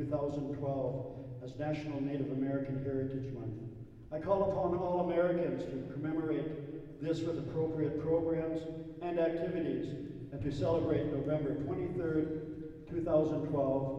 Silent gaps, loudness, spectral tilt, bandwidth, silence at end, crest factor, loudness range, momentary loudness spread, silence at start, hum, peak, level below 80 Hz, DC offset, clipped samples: none; -36 LUFS; -9 dB/octave; 8.2 kHz; 0 s; 18 dB; 3 LU; 12 LU; 0 s; none; -18 dBFS; -58 dBFS; under 0.1%; under 0.1%